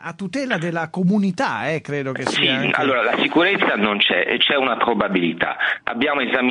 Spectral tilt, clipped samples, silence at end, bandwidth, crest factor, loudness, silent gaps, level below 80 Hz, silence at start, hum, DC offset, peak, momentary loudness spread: -5 dB/octave; under 0.1%; 0 s; 10 kHz; 18 dB; -19 LUFS; none; -60 dBFS; 0 s; none; under 0.1%; -2 dBFS; 7 LU